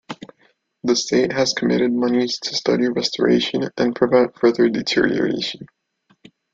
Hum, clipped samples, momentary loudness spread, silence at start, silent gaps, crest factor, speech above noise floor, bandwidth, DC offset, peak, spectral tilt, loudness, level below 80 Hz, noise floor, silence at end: none; under 0.1%; 8 LU; 0.1 s; none; 18 dB; 42 dB; 7.6 kHz; under 0.1%; -2 dBFS; -4.5 dB/octave; -19 LUFS; -58 dBFS; -61 dBFS; 0.9 s